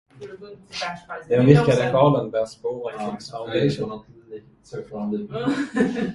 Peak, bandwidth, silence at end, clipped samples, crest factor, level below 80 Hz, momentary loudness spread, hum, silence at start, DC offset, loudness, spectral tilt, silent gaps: 0 dBFS; 11.5 kHz; 0 s; under 0.1%; 22 dB; -54 dBFS; 24 LU; none; 0.2 s; under 0.1%; -22 LUFS; -7 dB/octave; none